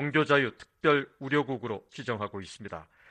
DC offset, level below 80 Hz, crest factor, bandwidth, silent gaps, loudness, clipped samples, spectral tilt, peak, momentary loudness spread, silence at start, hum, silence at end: under 0.1%; -66 dBFS; 20 dB; 9.6 kHz; none; -29 LUFS; under 0.1%; -6 dB/octave; -10 dBFS; 17 LU; 0 s; none; 0.3 s